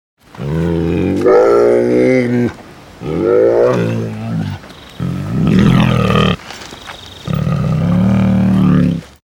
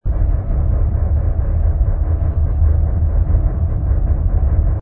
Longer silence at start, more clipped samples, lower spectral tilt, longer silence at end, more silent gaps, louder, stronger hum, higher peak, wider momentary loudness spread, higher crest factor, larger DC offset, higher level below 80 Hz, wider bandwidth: first, 0.35 s vs 0.05 s; neither; second, -8 dB/octave vs -14 dB/octave; first, 0.35 s vs 0 s; neither; first, -13 LUFS vs -18 LUFS; neither; about the same, 0 dBFS vs -2 dBFS; first, 15 LU vs 3 LU; about the same, 12 dB vs 12 dB; neither; second, -32 dBFS vs -16 dBFS; first, 18 kHz vs 2.2 kHz